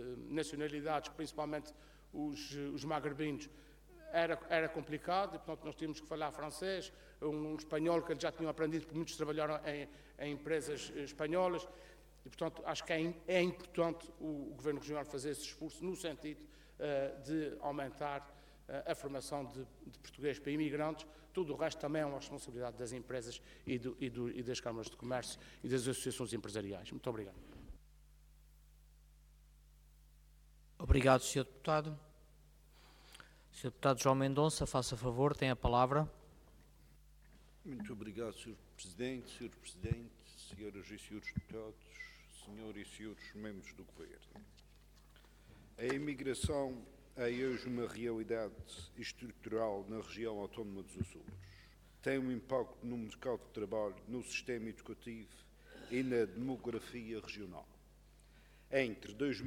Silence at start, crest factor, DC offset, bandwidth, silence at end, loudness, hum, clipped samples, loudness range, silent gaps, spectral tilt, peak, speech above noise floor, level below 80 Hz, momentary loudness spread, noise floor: 0 s; 28 dB; under 0.1%; 18 kHz; 0 s; -40 LUFS; none; under 0.1%; 10 LU; none; -5 dB/octave; -14 dBFS; 24 dB; -56 dBFS; 17 LU; -64 dBFS